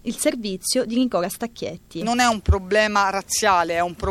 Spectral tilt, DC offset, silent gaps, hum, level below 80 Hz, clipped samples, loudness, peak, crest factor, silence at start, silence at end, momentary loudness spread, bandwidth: -4 dB/octave; under 0.1%; none; none; -34 dBFS; under 0.1%; -21 LUFS; 0 dBFS; 20 dB; 0.05 s; 0 s; 10 LU; 16.5 kHz